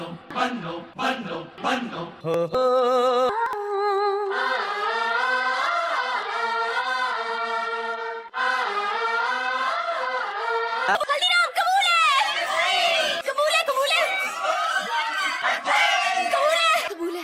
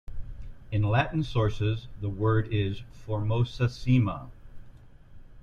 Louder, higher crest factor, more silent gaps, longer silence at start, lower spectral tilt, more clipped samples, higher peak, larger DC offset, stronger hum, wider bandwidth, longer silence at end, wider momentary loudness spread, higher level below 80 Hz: first, -23 LUFS vs -28 LUFS; about the same, 16 dB vs 16 dB; neither; about the same, 0 s vs 0.1 s; second, -2 dB/octave vs -8 dB/octave; neither; first, -8 dBFS vs -12 dBFS; neither; neither; first, 16 kHz vs 7 kHz; about the same, 0 s vs 0 s; second, 8 LU vs 19 LU; second, -68 dBFS vs -42 dBFS